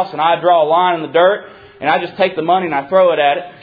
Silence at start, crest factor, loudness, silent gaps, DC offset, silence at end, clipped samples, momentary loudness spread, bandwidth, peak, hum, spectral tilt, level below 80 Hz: 0 s; 14 dB; -14 LUFS; none; under 0.1%; 0.1 s; under 0.1%; 5 LU; 5 kHz; 0 dBFS; none; -8 dB/octave; -60 dBFS